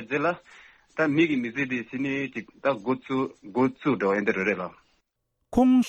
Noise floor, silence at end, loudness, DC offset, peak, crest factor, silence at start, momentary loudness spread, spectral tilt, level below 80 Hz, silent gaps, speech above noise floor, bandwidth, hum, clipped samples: -77 dBFS; 0 s; -26 LUFS; under 0.1%; -10 dBFS; 16 dB; 0 s; 8 LU; -6.5 dB/octave; -56 dBFS; none; 52 dB; 7.8 kHz; none; under 0.1%